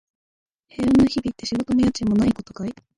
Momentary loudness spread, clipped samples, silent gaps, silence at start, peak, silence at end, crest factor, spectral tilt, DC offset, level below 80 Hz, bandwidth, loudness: 14 LU; under 0.1%; none; 0.8 s; -8 dBFS; 0.25 s; 14 dB; -6 dB/octave; under 0.1%; -44 dBFS; 11 kHz; -21 LUFS